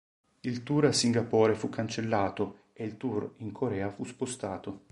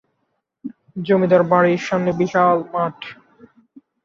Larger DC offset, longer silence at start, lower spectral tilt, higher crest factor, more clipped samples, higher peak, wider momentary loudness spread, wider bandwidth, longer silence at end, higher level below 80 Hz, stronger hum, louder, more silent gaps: neither; second, 0.45 s vs 0.65 s; second, -5 dB/octave vs -7 dB/octave; about the same, 20 dB vs 18 dB; neither; second, -10 dBFS vs -2 dBFS; second, 13 LU vs 21 LU; first, 11.5 kHz vs 7.2 kHz; second, 0.15 s vs 0.9 s; about the same, -62 dBFS vs -62 dBFS; neither; second, -31 LUFS vs -17 LUFS; neither